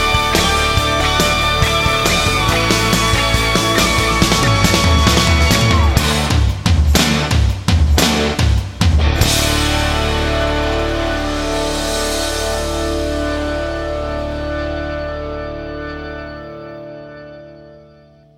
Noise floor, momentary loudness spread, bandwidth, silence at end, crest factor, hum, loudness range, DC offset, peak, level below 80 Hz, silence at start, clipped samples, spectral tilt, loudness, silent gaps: -45 dBFS; 14 LU; 16.5 kHz; 0.6 s; 16 dB; none; 11 LU; under 0.1%; 0 dBFS; -22 dBFS; 0 s; under 0.1%; -4 dB/octave; -15 LUFS; none